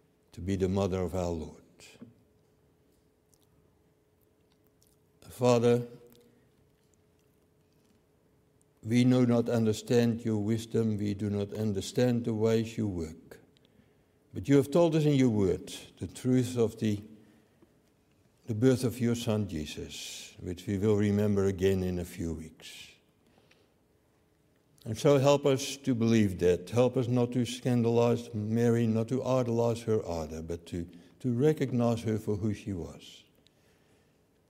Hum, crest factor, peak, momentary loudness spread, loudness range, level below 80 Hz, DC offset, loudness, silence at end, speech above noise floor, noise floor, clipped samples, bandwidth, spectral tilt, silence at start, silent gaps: none; 20 dB; -10 dBFS; 15 LU; 6 LU; -58 dBFS; under 0.1%; -29 LUFS; 1.35 s; 40 dB; -68 dBFS; under 0.1%; 16 kHz; -7 dB/octave; 0.35 s; none